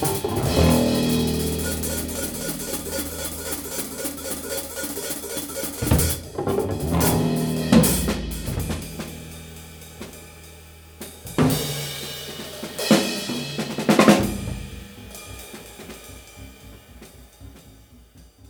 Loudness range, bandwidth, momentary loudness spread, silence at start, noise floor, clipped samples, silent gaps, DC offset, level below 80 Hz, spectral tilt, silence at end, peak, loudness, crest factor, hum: 11 LU; over 20 kHz; 21 LU; 0 s; -49 dBFS; under 0.1%; none; under 0.1%; -38 dBFS; -4.5 dB/octave; 0.2 s; -2 dBFS; -23 LUFS; 22 dB; none